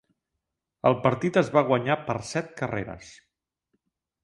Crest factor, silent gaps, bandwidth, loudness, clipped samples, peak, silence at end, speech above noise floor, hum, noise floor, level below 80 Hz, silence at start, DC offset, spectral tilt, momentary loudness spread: 22 dB; none; 11.5 kHz; -25 LUFS; under 0.1%; -6 dBFS; 1.1 s; 58 dB; none; -83 dBFS; -58 dBFS; 0.85 s; under 0.1%; -6.5 dB/octave; 11 LU